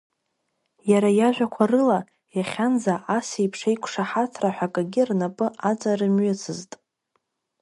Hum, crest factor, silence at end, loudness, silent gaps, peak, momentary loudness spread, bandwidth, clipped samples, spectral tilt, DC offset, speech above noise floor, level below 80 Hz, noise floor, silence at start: none; 18 dB; 1 s; -23 LUFS; none; -6 dBFS; 10 LU; 11.5 kHz; under 0.1%; -6 dB/octave; under 0.1%; 53 dB; -72 dBFS; -76 dBFS; 0.85 s